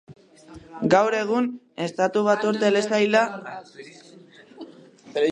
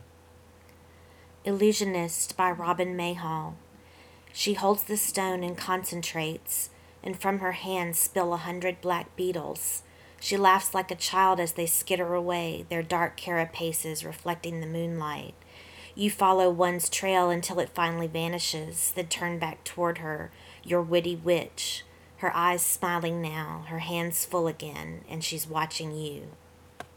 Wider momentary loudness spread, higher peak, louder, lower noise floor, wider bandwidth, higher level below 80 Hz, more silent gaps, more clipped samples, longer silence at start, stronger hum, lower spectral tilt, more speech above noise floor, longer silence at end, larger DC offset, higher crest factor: first, 24 LU vs 12 LU; first, -4 dBFS vs -8 dBFS; first, -22 LUFS vs -28 LUFS; second, -49 dBFS vs -55 dBFS; second, 10.5 kHz vs over 20 kHz; about the same, -66 dBFS vs -64 dBFS; neither; neither; second, 0.1 s vs 1.45 s; neither; first, -5 dB/octave vs -3.5 dB/octave; about the same, 26 dB vs 26 dB; about the same, 0 s vs 0.1 s; neither; about the same, 20 dB vs 22 dB